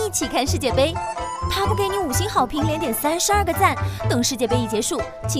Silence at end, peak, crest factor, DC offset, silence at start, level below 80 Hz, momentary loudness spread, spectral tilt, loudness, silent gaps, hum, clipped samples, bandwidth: 0 s; -4 dBFS; 18 dB; under 0.1%; 0 s; -36 dBFS; 6 LU; -4 dB/octave; -21 LUFS; none; none; under 0.1%; 16 kHz